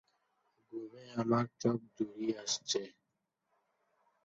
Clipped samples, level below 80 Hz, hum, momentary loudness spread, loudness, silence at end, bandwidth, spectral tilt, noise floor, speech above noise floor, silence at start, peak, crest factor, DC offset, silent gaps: under 0.1%; -78 dBFS; none; 14 LU; -36 LUFS; 1.35 s; 7.6 kHz; -5 dB/octave; -85 dBFS; 48 dB; 0.7 s; -18 dBFS; 22 dB; under 0.1%; none